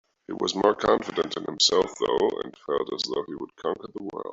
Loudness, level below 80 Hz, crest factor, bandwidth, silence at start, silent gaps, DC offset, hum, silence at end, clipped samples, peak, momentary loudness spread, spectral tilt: -26 LUFS; -60 dBFS; 20 dB; 8 kHz; 0.3 s; none; under 0.1%; none; 0 s; under 0.1%; -6 dBFS; 14 LU; -3 dB/octave